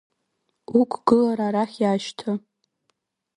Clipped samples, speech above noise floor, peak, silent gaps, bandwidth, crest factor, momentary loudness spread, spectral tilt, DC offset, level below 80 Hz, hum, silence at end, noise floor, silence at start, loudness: under 0.1%; 53 dB; -4 dBFS; none; 10.5 kHz; 20 dB; 10 LU; -6.5 dB/octave; under 0.1%; -64 dBFS; none; 1 s; -75 dBFS; 0.7 s; -23 LUFS